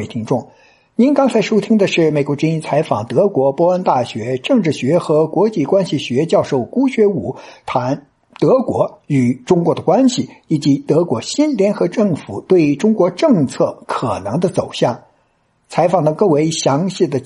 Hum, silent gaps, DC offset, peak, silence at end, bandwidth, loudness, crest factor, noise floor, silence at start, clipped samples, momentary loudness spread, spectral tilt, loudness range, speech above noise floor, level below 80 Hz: none; none; under 0.1%; -2 dBFS; 0 s; 11.5 kHz; -16 LUFS; 14 dB; -60 dBFS; 0 s; under 0.1%; 7 LU; -6.5 dB/octave; 2 LU; 45 dB; -56 dBFS